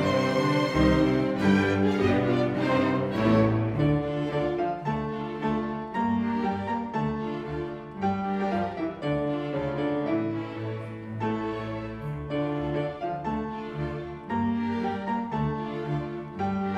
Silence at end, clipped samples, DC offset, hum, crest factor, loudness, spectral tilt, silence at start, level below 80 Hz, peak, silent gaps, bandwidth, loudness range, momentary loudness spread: 0 s; under 0.1%; under 0.1%; none; 18 dB; -28 LUFS; -7.5 dB/octave; 0 s; -46 dBFS; -10 dBFS; none; 11 kHz; 7 LU; 10 LU